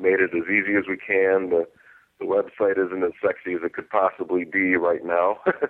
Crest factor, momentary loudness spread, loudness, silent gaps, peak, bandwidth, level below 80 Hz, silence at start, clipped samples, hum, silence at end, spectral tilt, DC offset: 16 dB; 7 LU; -23 LUFS; none; -6 dBFS; 4 kHz; -66 dBFS; 0 s; under 0.1%; none; 0 s; -9 dB/octave; under 0.1%